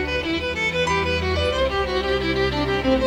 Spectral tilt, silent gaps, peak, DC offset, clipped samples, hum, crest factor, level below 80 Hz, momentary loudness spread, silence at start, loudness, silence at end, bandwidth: -5 dB/octave; none; -8 dBFS; under 0.1%; under 0.1%; none; 12 dB; -34 dBFS; 2 LU; 0 s; -22 LUFS; 0 s; 16.5 kHz